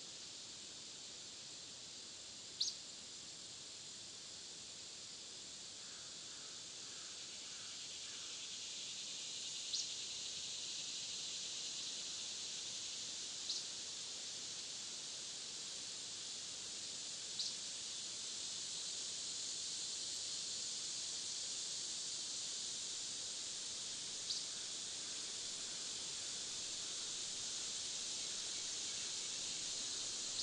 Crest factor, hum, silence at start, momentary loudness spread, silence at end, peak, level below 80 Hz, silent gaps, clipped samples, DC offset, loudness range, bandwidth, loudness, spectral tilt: 22 dB; none; 0 s; 8 LU; 0 s; -24 dBFS; -82 dBFS; none; under 0.1%; under 0.1%; 6 LU; 12 kHz; -43 LUFS; 1 dB/octave